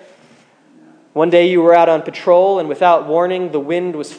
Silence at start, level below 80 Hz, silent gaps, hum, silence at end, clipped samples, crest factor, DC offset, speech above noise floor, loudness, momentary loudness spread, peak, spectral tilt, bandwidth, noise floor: 1.15 s; -74 dBFS; none; none; 0 s; under 0.1%; 14 dB; under 0.1%; 36 dB; -13 LUFS; 9 LU; 0 dBFS; -6.5 dB/octave; 9.6 kHz; -49 dBFS